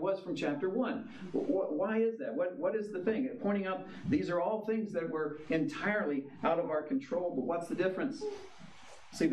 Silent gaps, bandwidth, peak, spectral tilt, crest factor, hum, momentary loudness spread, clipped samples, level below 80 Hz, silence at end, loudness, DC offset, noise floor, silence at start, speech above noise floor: none; 12.5 kHz; -18 dBFS; -6.5 dB/octave; 16 dB; none; 7 LU; under 0.1%; -72 dBFS; 0 s; -34 LUFS; under 0.1%; -55 dBFS; 0 s; 21 dB